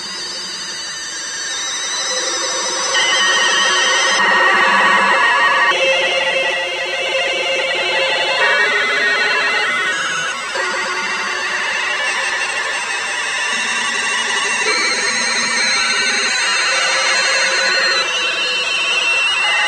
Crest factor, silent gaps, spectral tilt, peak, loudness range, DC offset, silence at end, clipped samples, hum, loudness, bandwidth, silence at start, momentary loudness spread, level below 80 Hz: 16 dB; none; 0.5 dB/octave; 0 dBFS; 5 LU; under 0.1%; 0 s; under 0.1%; none; -14 LUFS; 15 kHz; 0 s; 7 LU; -62 dBFS